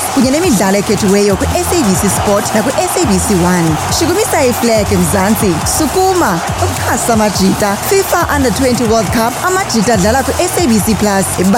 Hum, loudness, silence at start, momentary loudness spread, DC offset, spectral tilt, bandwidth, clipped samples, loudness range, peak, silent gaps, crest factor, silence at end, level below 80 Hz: none; -11 LUFS; 0 s; 2 LU; under 0.1%; -4.5 dB/octave; 17 kHz; under 0.1%; 1 LU; 0 dBFS; none; 10 dB; 0 s; -30 dBFS